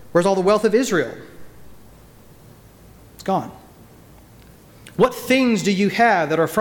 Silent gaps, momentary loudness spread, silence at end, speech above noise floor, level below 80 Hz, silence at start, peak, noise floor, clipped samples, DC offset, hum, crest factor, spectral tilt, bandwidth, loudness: none; 14 LU; 0 s; 28 dB; -54 dBFS; 0 s; -6 dBFS; -46 dBFS; under 0.1%; under 0.1%; none; 16 dB; -5 dB/octave; 19 kHz; -19 LUFS